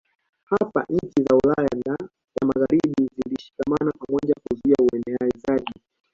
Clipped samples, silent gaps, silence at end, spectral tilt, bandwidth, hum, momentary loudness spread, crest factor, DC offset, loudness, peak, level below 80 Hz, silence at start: under 0.1%; none; 0.4 s; -8 dB/octave; 7.4 kHz; none; 10 LU; 18 dB; under 0.1%; -23 LUFS; -6 dBFS; -52 dBFS; 0.5 s